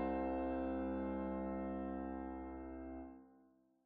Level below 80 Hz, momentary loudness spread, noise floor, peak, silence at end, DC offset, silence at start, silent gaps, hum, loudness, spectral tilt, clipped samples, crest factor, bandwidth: -56 dBFS; 11 LU; -71 dBFS; -30 dBFS; 0.45 s; under 0.1%; 0 s; none; none; -43 LUFS; -8 dB/octave; under 0.1%; 14 dB; 4.3 kHz